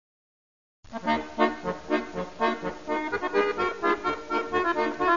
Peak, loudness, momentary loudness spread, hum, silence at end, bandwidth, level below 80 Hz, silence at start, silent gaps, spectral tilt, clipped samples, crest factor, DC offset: -8 dBFS; -28 LUFS; 8 LU; none; 0 s; 7.4 kHz; -56 dBFS; 0.85 s; none; -5 dB/octave; under 0.1%; 20 dB; 0.4%